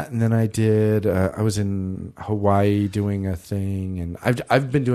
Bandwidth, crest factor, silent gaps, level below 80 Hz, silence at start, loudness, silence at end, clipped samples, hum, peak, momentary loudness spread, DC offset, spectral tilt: 13.5 kHz; 18 dB; none; -48 dBFS; 0 s; -22 LUFS; 0 s; under 0.1%; none; -2 dBFS; 9 LU; under 0.1%; -7.5 dB/octave